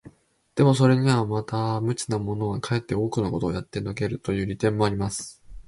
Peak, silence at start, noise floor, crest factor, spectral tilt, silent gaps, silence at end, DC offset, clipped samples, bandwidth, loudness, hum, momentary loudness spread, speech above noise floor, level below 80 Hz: -6 dBFS; 0.05 s; -54 dBFS; 18 dB; -6.5 dB/octave; none; 0.05 s; under 0.1%; under 0.1%; 11.5 kHz; -25 LUFS; none; 11 LU; 30 dB; -48 dBFS